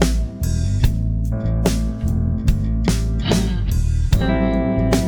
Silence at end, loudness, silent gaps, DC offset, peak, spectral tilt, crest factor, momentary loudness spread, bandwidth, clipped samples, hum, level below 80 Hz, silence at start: 0 s; -20 LUFS; none; under 0.1%; 0 dBFS; -6.5 dB/octave; 18 dB; 4 LU; 19.5 kHz; under 0.1%; none; -22 dBFS; 0 s